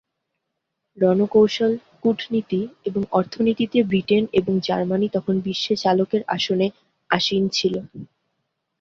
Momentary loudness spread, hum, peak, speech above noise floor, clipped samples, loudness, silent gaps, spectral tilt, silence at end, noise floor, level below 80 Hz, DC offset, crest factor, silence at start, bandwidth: 7 LU; none; -2 dBFS; 58 dB; under 0.1%; -21 LUFS; none; -6 dB/octave; 0.75 s; -79 dBFS; -58 dBFS; under 0.1%; 18 dB; 0.95 s; 7.6 kHz